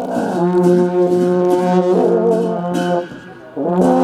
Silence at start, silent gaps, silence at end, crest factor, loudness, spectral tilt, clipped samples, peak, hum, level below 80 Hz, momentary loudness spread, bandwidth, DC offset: 0 s; none; 0 s; 14 dB; -15 LUFS; -8 dB/octave; under 0.1%; -2 dBFS; none; -58 dBFS; 9 LU; 12 kHz; under 0.1%